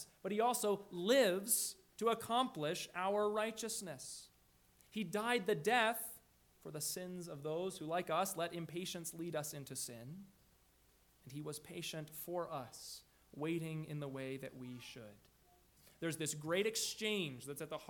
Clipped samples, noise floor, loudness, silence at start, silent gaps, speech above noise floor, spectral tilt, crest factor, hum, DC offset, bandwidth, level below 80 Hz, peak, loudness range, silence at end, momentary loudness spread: under 0.1%; -71 dBFS; -40 LUFS; 0 s; none; 31 dB; -3.5 dB/octave; 22 dB; none; under 0.1%; 19 kHz; -78 dBFS; -18 dBFS; 11 LU; 0 s; 16 LU